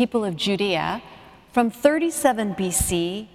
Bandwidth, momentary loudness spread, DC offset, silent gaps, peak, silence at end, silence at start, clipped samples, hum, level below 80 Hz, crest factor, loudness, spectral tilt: 16.5 kHz; 6 LU; under 0.1%; none; -2 dBFS; 0.1 s; 0 s; under 0.1%; none; -44 dBFS; 22 dB; -22 LUFS; -4 dB/octave